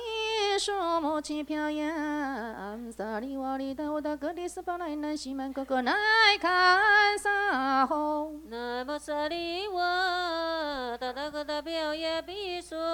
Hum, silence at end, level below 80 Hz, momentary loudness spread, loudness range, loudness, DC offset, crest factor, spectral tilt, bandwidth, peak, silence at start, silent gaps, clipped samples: none; 0 s; -60 dBFS; 14 LU; 10 LU; -28 LUFS; under 0.1%; 20 dB; -2 dB/octave; 19 kHz; -10 dBFS; 0 s; none; under 0.1%